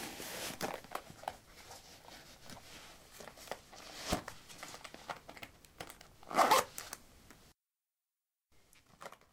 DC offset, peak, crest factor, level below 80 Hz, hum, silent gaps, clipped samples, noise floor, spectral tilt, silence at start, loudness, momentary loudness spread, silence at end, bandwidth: under 0.1%; -14 dBFS; 28 dB; -64 dBFS; none; none; under 0.1%; under -90 dBFS; -2.5 dB/octave; 0 s; -38 LUFS; 22 LU; 0.2 s; 17.5 kHz